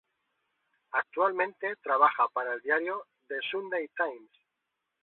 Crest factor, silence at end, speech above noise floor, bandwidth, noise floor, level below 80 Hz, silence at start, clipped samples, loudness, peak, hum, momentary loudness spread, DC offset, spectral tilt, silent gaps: 22 dB; 0.8 s; 54 dB; 4.2 kHz; -84 dBFS; -82 dBFS; 0.95 s; under 0.1%; -30 LUFS; -10 dBFS; none; 11 LU; under 0.1%; -6.5 dB/octave; none